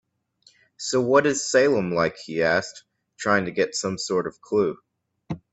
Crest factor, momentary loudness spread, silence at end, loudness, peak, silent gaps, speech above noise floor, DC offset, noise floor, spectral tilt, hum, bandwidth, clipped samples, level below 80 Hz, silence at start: 20 dB; 13 LU; 0.15 s; -23 LUFS; -4 dBFS; none; 38 dB; under 0.1%; -60 dBFS; -4 dB/octave; none; 8.4 kHz; under 0.1%; -62 dBFS; 0.8 s